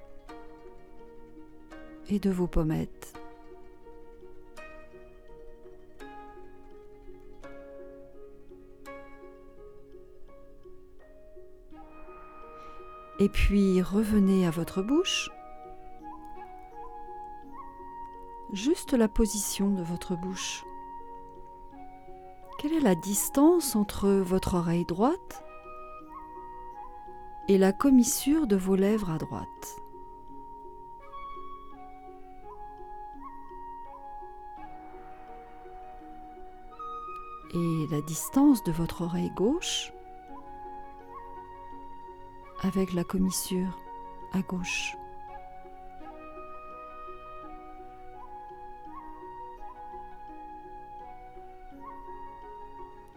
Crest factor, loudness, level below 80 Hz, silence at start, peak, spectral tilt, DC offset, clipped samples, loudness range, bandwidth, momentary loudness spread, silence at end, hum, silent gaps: 20 dB; -28 LUFS; -46 dBFS; 0 s; -12 dBFS; -5 dB/octave; under 0.1%; under 0.1%; 23 LU; 19.5 kHz; 24 LU; 0 s; none; none